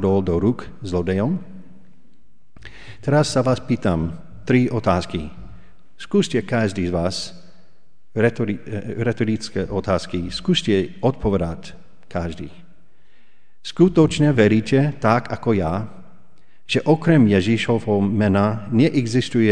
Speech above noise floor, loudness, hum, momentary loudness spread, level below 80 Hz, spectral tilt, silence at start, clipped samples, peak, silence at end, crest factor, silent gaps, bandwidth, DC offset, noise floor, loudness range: 43 dB; -20 LUFS; none; 14 LU; -44 dBFS; -6.5 dB/octave; 0 s; under 0.1%; -2 dBFS; 0 s; 20 dB; none; 10 kHz; 2%; -63 dBFS; 5 LU